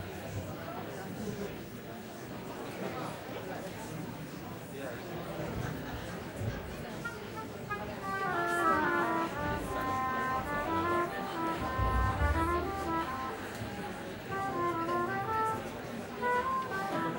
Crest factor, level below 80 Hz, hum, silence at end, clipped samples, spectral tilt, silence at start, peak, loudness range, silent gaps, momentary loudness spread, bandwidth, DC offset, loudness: 20 dB; -48 dBFS; none; 0 s; under 0.1%; -5.5 dB/octave; 0 s; -16 dBFS; 9 LU; none; 11 LU; 16.5 kHz; under 0.1%; -35 LUFS